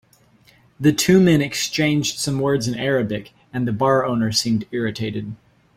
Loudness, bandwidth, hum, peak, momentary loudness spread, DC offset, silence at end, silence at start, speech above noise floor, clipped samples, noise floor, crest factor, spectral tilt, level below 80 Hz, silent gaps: -19 LUFS; 16.5 kHz; none; -4 dBFS; 12 LU; under 0.1%; 0.4 s; 0.8 s; 35 dB; under 0.1%; -54 dBFS; 18 dB; -5 dB/octave; -52 dBFS; none